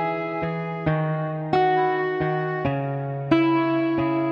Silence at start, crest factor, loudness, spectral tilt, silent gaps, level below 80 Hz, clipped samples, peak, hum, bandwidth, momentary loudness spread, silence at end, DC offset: 0 s; 18 dB; -23 LUFS; -9 dB/octave; none; -54 dBFS; under 0.1%; -4 dBFS; none; 5.6 kHz; 7 LU; 0 s; under 0.1%